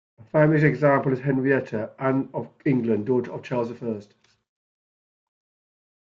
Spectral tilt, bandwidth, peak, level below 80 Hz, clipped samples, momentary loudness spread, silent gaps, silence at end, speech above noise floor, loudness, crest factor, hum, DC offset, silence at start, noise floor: -9.5 dB/octave; 7 kHz; -6 dBFS; -62 dBFS; under 0.1%; 12 LU; none; 2 s; over 67 dB; -23 LUFS; 18 dB; none; under 0.1%; 0.2 s; under -90 dBFS